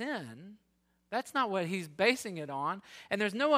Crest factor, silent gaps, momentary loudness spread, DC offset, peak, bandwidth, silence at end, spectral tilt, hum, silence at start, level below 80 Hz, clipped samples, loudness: 20 dB; none; 12 LU; under 0.1%; -14 dBFS; 16 kHz; 0 s; -4.5 dB/octave; none; 0 s; -78 dBFS; under 0.1%; -33 LUFS